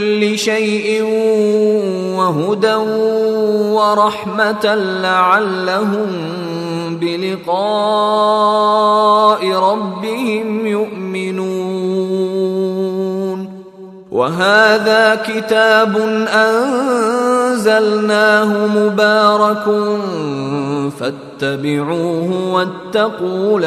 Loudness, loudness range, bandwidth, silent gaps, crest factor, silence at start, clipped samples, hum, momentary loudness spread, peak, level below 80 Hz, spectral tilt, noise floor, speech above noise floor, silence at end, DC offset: -14 LUFS; 6 LU; 14 kHz; none; 14 dB; 0 s; under 0.1%; none; 9 LU; 0 dBFS; -62 dBFS; -5 dB/octave; -35 dBFS; 21 dB; 0 s; under 0.1%